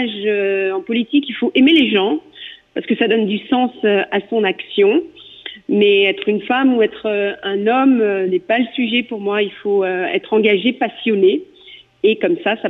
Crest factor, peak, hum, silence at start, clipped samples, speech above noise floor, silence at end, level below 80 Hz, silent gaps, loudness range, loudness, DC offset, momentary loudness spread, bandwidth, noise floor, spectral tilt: 14 dB; -4 dBFS; none; 0 s; under 0.1%; 27 dB; 0 s; -64 dBFS; none; 2 LU; -16 LUFS; under 0.1%; 7 LU; 4.1 kHz; -43 dBFS; -7.5 dB/octave